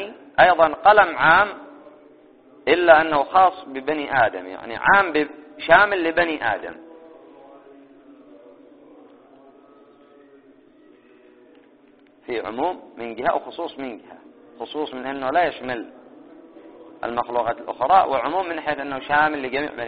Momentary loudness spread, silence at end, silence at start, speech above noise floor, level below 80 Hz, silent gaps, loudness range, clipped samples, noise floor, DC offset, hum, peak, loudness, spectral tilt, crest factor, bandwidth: 18 LU; 0 s; 0 s; 34 dB; -56 dBFS; none; 12 LU; under 0.1%; -53 dBFS; under 0.1%; none; 0 dBFS; -19 LUFS; -1.5 dB/octave; 22 dB; 4.9 kHz